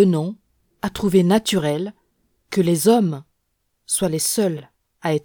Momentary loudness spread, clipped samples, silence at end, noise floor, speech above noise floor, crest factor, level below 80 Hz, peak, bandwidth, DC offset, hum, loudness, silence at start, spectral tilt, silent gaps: 14 LU; under 0.1%; 0.05 s; -71 dBFS; 53 dB; 18 dB; -54 dBFS; -4 dBFS; over 20 kHz; under 0.1%; none; -20 LUFS; 0 s; -5 dB/octave; none